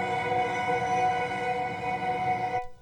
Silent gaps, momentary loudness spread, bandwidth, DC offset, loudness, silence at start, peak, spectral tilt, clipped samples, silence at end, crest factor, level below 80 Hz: none; 4 LU; 11 kHz; under 0.1%; -28 LUFS; 0 s; -16 dBFS; -5 dB/octave; under 0.1%; 0.05 s; 12 dB; -56 dBFS